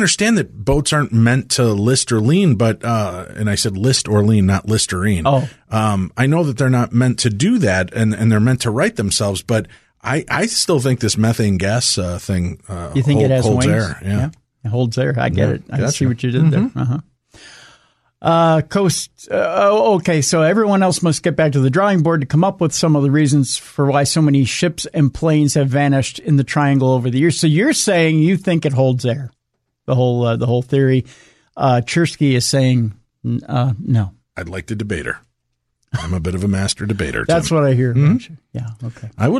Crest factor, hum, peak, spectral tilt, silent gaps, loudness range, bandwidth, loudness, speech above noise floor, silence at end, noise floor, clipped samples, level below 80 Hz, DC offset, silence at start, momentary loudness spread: 12 dB; none; -4 dBFS; -5.5 dB/octave; none; 4 LU; 13 kHz; -16 LUFS; 57 dB; 0 s; -73 dBFS; under 0.1%; -42 dBFS; under 0.1%; 0 s; 9 LU